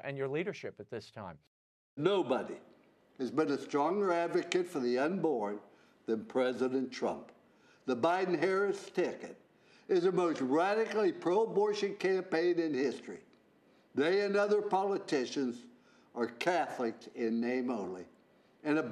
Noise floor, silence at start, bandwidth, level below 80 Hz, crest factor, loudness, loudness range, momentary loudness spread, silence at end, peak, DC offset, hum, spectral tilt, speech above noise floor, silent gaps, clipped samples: -66 dBFS; 0.05 s; 11.5 kHz; -88 dBFS; 20 dB; -33 LUFS; 4 LU; 15 LU; 0 s; -12 dBFS; under 0.1%; none; -5.5 dB/octave; 33 dB; 1.47-1.97 s; under 0.1%